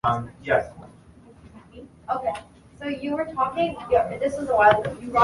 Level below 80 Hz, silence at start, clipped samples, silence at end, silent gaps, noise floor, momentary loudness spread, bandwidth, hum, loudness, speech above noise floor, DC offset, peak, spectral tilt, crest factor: -50 dBFS; 0.05 s; under 0.1%; 0 s; none; -50 dBFS; 15 LU; 11.5 kHz; none; -24 LUFS; 27 dB; under 0.1%; -2 dBFS; -6 dB/octave; 22 dB